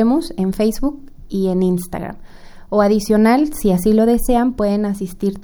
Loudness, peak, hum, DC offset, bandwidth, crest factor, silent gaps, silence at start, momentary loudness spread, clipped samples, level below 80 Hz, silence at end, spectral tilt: -17 LUFS; -2 dBFS; none; under 0.1%; over 20 kHz; 14 dB; none; 0 s; 11 LU; under 0.1%; -32 dBFS; 0 s; -6.5 dB/octave